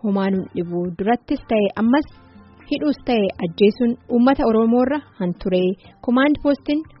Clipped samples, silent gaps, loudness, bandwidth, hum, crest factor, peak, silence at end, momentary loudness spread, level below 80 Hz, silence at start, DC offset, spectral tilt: under 0.1%; none; -20 LUFS; 5.8 kHz; none; 16 dB; -4 dBFS; 0.15 s; 8 LU; -46 dBFS; 0.05 s; under 0.1%; -5.5 dB/octave